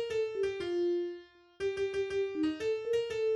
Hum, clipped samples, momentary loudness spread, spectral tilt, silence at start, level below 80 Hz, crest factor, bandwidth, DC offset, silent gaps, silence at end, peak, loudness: none; under 0.1%; 5 LU; -5 dB/octave; 0 s; -66 dBFS; 10 dB; 11.5 kHz; under 0.1%; none; 0 s; -22 dBFS; -34 LUFS